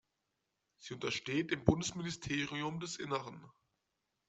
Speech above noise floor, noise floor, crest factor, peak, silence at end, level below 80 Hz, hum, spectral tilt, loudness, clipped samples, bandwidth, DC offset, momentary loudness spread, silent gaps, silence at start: 48 dB; -86 dBFS; 30 dB; -10 dBFS; 0.8 s; -60 dBFS; none; -4.5 dB/octave; -37 LUFS; under 0.1%; 8.2 kHz; under 0.1%; 17 LU; none; 0.8 s